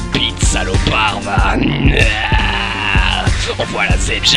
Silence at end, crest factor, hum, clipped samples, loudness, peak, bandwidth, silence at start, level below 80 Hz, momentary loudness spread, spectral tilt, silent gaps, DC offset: 0 s; 14 dB; none; under 0.1%; -14 LUFS; 0 dBFS; 11 kHz; 0 s; -18 dBFS; 3 LU; -4 dB/octave; none; under 0.1%